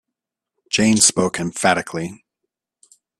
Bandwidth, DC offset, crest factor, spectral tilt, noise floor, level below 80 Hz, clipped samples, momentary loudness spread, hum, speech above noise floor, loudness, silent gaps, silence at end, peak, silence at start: 13 kHz; under 0.1%; 22 dB; -3 dB/octave; -83 dBFS; -56 dBFS; under 0.1%; 15 LU; none; 65 dB; -17 LUFS; none; 1.05 s; 0 dBFS; 0.7 s